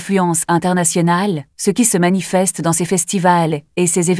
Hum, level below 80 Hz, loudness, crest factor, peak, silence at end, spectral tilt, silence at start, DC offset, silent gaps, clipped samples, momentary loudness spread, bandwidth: none; -56 dBFS; -15 LUFS; 16 dB; 0 dBFS; 0 s; -4.5 dB/octave; 0 s; under 0.1%; none; under 0.1%; 5 LU; 11 kHz